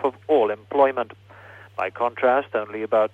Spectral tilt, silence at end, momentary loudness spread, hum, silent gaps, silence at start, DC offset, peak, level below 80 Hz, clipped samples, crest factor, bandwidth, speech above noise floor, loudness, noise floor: -7 dB/octave; 0.05 s; 10 LU; none; none; 0 s; under 0.1%; -6 dBFS; -70 dBFS; under 0.1%; 16 dB; 4.9 kHz; 23 dB; -22 LUFS; -45 dBFS